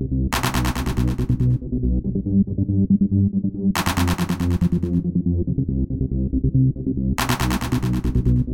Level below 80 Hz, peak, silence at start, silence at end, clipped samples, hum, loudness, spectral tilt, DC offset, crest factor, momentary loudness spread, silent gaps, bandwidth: -28 dBFS; -4 dBFS; 0 s; 0 s; under 0.1%; none; -21 LUFS; -6.5 dB/octave; under 0.1%; 16 dB; 4 LU; none; 17.5 kHz